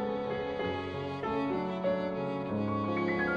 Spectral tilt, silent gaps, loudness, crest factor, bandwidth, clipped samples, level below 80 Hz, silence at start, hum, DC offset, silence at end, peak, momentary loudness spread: -8 dB/octave; none; -33 LUFS; 14 dB; 8 kHz; under 0.1%; -58 dBFS; 0 s; none; under 0.1%; 0 s; -20 dBFS; 4 LU